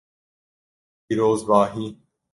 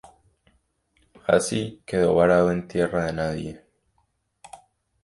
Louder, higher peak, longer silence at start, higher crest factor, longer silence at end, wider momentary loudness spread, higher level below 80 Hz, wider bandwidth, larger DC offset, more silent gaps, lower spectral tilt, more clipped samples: about the same, -21 LUFS vs -23 LUFS; about the same, -2 dBFS vs -4 dBFS; second, 1.1 s vs 1.3 s; about the same, 22 dB vs 20 dB; about the same, 0.4 s vs 0.45 s; about the same, 14 LU vs 13 LU; second, -60 dBFS vs -50 dBFS; about the same, 11.5 kHz vs 11.5 kHz; neither; neither; about the same, -6.5 dB/octave vs -5.5 dB/octave; neither